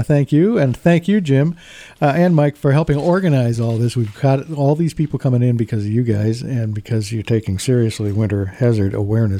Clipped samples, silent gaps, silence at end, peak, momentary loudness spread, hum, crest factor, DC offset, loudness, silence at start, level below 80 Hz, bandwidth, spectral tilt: under 0.1%; none; 0 s; 0 dBFS; 6 LU; none; 16 dB; under 0.1%; -17 LUFS; 0 s; -46 dBFS; 14 kHz; -8 dB/octave